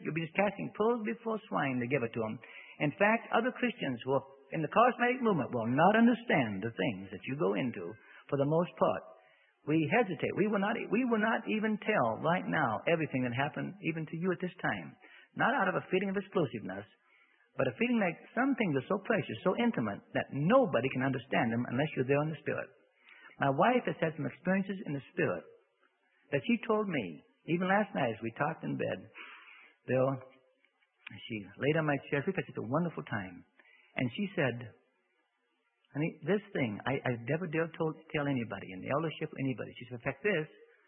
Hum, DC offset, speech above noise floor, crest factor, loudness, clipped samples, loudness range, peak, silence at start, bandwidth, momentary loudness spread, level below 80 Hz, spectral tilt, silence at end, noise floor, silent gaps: none; under 0.1%; 46 dB; 20 dB; -33 LUFS; under 0.1%; 6 LU; -12 dBFS; 0 s; 3.9 kHz; 13 LU; -72 dBFS; -10.5 dB/octave; 0.4 s; -78 dBFS; none